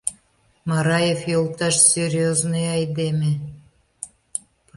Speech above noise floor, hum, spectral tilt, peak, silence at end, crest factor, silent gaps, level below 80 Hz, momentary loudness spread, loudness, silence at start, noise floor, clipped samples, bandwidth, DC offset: 41 dB; none; -4 dB/octave; -2 dBFS; 0.4 s; 20 dB; none; -56 dBFS; 19 LU; -20 LUFS; 0.05 s; -61 dBFS; under 0.1%; 11.5 kHz; under 0.1%